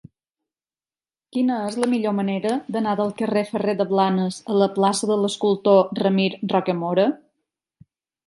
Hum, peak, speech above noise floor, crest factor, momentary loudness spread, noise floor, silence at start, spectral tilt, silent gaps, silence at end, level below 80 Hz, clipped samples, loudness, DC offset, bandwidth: none; -4 dBFS; over 69 dB; 18 dB; 7 LU; under -90 dBFS; 1.35 s; -6 dB/octave; none; 1.1 s; -70 dBFS; under 0.1%; -21 LUFS; under 0.1%; 11.5 kHz